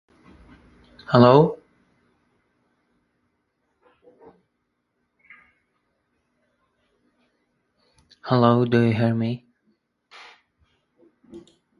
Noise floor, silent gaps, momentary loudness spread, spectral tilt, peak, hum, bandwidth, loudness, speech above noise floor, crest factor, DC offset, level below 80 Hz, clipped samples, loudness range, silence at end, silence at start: -75 dBFS; none; 25 LU; -9 dB/octave; 0 dBFS; none; 6.8 kHz; -19 LUFS; 58 dB; 26 dB; under 0.1%; -60 dBFS; under 0.1%; 4 LU; 0.4 s; 1.1 s